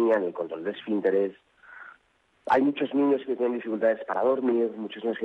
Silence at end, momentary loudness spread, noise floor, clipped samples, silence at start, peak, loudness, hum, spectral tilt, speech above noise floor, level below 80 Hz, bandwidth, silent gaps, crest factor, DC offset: 0 s; 9 LU; -67 dBFS; under 0.1%; 0 s; -12 dBFS; -26 LUFS; none; -7.5 dB/octave; 41 dB; -74 dBFS; 6 kHz; none; 14 dB; under 0.1%